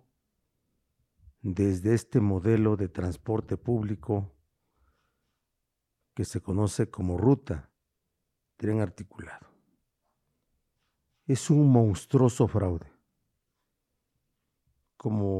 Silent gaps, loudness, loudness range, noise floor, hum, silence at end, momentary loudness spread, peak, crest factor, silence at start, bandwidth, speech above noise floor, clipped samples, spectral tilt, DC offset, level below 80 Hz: none; -27 LUFS; 9 LU; -82 dBFS; none; 0 s; 15 LU; -8 dBFS; 20 dB; 1.45 s; 12.5 kHz; 56 dB; under 0.1%; -8 dB/octave; under 0.1%; -54 dBFS